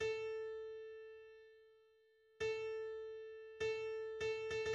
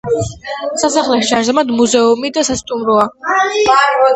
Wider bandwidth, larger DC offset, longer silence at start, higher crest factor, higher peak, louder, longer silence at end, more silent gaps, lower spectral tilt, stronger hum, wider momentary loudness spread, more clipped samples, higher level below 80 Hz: about the same, 9 kHz vs 9 kHz; neither; about the same, 0 s vs 0.05 s; about the same, 14 dB vs 14 dB; second, -32 dBFS vs 0 dBFS; second, -45 LUFS vs -13 LUFS; about the same, 0 s vs 0 s; neither; about the same, -3 dB/octave vs -3 dB/octave; neither; first, 16 LU vs 8 LU; neither; second, -74 dBFS vs -44 dBFS